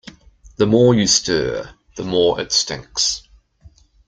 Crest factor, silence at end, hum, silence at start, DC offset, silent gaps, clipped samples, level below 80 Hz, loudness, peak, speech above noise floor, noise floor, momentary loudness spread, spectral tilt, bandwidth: 18 dB; 0.4 s; none; 0.45 s; under 0.1%; none; under 0.1%; -46 dBFS; -17 LUFS; -2 dBFS; 32 dB; -49 dBFS; 16 LU; -3.5 dB/octave; 10 kHz